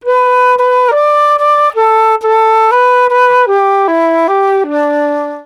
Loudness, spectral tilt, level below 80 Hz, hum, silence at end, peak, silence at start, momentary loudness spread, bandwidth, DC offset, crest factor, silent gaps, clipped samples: -9 LUFS; -3 dB/octave; -62 dBFS; none; 0.05 s; -2 dBFS; 0.05 s; 4 LU; 12 kHz; under 0.1%; 8 dB; none; under 0.1%